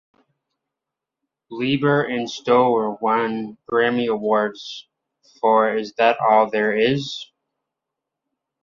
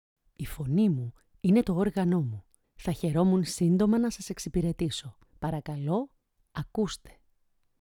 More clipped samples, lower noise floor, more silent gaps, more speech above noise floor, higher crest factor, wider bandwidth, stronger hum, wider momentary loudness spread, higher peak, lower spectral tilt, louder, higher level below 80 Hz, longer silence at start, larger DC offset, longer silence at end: neither; first, -85 dBFS vs -70 dBFS; neither; first, 66 dB vs 42 dB; about the same, 18 dB vs 16 dB; second, 7.4 kHz vs 17 kHz; neither; second, 13 LU vs 16 LU; first, -4 dBFS vs -12 dBFS; about the same, -6 dB/octave vs -7 dB/octave; first, -20 LUFS vs -29 LUFS; second, -66 dBFS vs -50 dBFS; first, 1.5 s vs 0.4 s; neither; first, 1.4 s vs 0.85 s